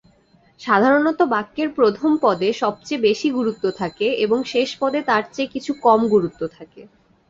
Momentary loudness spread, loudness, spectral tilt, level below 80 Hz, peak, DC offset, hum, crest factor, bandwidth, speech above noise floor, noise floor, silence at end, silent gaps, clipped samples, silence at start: 9 LU; -19 LUFS; -5.5 dB/octave; -60 dBFS; -2 dBFS; under 0.1%; none; 18 dB; 7.8 kHz; 37 dB; -56 dBFS; 0.45 s; none; under 0.1%; 0.6 s